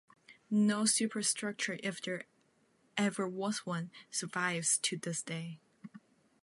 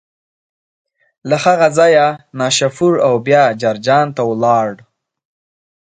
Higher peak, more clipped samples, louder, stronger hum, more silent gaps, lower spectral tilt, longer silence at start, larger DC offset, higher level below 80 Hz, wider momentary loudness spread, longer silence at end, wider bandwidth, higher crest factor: second, -18 dBFS vs 0 dBFS; neither; second, -34 LUFS vs -13 LUFS; neither; neither; second, -3 dB/octave vs -4.5 dB/octave; second, 0.3 s vs 1.25 s; neither; second, -86 dBFS vs -60 dBFS; first, 16 LU vs 7 LU; second, 0.45 s vs 1.2 s; first, 11.5 kHz vs 9.4 kHz; about the same, 18 dB vs 14 dB